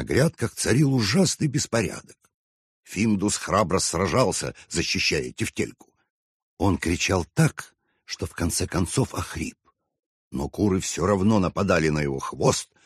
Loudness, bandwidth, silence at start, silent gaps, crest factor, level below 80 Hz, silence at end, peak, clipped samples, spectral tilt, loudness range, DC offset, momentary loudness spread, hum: -24 LUFS; 13 kHz; 0 s; 2.34-2.83 s, 6.10-6.57 s, 10.06-10.31 s; 18 dB; -46 dBFS; 0.2 s; -6 dBFS; under 0.1%; -4.5 dB/octave; 3 LU; under 0.1%; 11 LU; none